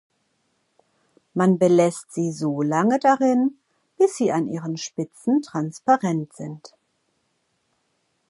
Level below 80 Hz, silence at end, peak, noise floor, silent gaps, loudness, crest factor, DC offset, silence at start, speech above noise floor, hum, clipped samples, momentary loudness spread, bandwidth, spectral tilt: -72 dBFS; 1.6 s; -4 dBFS; -71 dBFS; none; -22 LUFS; 18 dB; under 0.1%; 1.35 s; 50 dB; none; under 0.1%; 12 LU; 11.5 kHz; -6.5 dB/octave